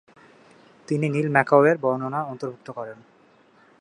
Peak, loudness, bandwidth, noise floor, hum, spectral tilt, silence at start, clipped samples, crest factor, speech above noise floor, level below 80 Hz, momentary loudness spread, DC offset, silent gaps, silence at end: -2 dBFS; -22 LUFS; 11 kHz; -57 dBFS; none; -8 dB/octave; 0.9 s; under 0.1%; 22 dB; 34 dB; -72 dBFS; 18 LU; under 0.1%; none; 0.85 s